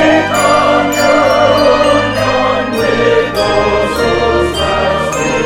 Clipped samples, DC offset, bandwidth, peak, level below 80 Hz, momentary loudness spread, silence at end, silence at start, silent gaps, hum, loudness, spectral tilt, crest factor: under 0.1%; under 0.1%; 17 kHz; 0 dBFS; -32 dBFS; 4 LU; 0 s; 0 s; none; none; -11 LUFS; -4.5 dB/octave; 10 dB